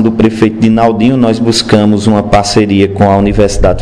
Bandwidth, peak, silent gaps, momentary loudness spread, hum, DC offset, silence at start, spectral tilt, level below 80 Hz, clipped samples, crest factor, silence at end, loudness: 11 kHz; 0 dBFS; none; 2 LU; none; 1%; 0 s; -6 dB/octave; -24 dBFS; 4%; 8 dB; 0 s; -9 LUFS